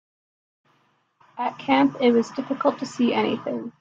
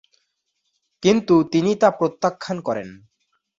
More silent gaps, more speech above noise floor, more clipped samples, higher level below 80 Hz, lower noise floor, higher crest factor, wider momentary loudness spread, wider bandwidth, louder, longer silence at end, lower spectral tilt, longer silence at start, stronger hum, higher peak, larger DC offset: neither; second, 43 dB vs 55 dB; neither; second, -70 dBFS vs -62 dBFS; second, -66 dBFS vs -74 dBFS; about the same, 18 dB vs 18 dB; about the same, 11 LU vs 11 LU; about the same, 7.8 kHz vs 7.6 kHz; second, -23 LUFS vs -20 LUFS; second, 0.1 s vs 0.65 s; about the same, -5.5 dB/octave vs -6 dB/octave; first, 1.35 s vs 1 s; neither; second, -6 dBFS vs -2 dBFS; neither